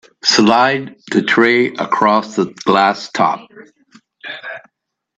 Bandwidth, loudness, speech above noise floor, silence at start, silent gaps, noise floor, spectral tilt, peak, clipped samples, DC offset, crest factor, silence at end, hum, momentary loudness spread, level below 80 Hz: 8.6 kHz; -14 LUFS; 61 dB; 0.25 s; none; -75 dBFS; -4 dB/octave; 0 dBFS; under 0.1%; under 0.1%; 16 dB; 0.6 s; none; 17 LU; -60 dBFS